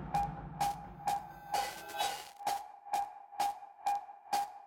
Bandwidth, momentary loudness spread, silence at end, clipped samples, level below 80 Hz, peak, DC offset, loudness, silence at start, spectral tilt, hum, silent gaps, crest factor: 19 kHz; 3 LU; 0 s; under 0.1%; -60 dBFS; -22 dBFS; under 0.1%; -38 LUFS; 0 s; -3 dB/octave; none; none; 16 dB